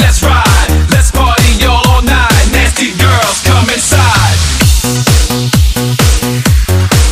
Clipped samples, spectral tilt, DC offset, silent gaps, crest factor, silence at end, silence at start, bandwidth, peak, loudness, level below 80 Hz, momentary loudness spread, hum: 0.2%; -4 dB/octave; under 0.1%; none; 8 dB; 0 s; 0 s; 16 kHz; 0 dBFS; -8 LUFS; -12 dBFS; 2 LU; none